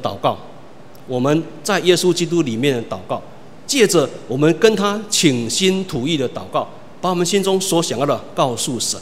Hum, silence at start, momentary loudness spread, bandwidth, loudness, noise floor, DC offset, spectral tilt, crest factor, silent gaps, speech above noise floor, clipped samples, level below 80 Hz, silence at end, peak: none; 0 s; 10 LU; 16 kHz; -18 LUFS; -42 dBFS; 1%; -4 dB/octave; 18 dB; none; 24 dB; under 0.1%; -56 dBFS; 0 s; 0 dBFS